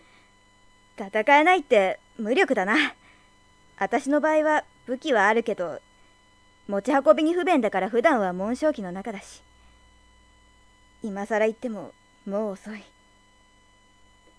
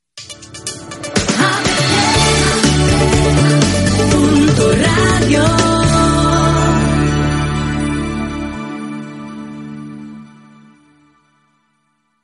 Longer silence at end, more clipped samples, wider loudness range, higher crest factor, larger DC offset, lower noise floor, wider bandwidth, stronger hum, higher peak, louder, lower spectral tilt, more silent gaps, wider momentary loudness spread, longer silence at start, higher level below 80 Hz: second, 1.55 s vs 2 s; neither; second, 9 LU vs 16 LU; first, 22 dB vs 14 dB; neither; second, -58 dBFS vs -63 dBFS; about the same, 11 kHz vs 12 kHz; neither; second, -4 dBFS vs 0 dBFS; second, -23 LUFS vs -13 LUFS; about the same, -5 dB/octave vs -4.5 dB/octave; neither; about the same, 18 LU vs 18 LU; first, 1 s vs 0.15 s; second, -62 dBFS vs -28 dBFS